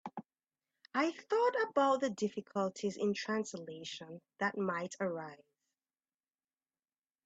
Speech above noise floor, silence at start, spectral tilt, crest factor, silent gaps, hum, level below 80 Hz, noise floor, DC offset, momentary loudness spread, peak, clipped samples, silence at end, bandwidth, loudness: over 54 dB; 0.05 s; -4.5 dB/octave; 20 dB; none; none; -84 dBFS; under -90 dBFS; under 0.1%; 14 LU; -18 dBFS; under 0.1%; 1.9 s; 8.4 kHz; -36 LUFS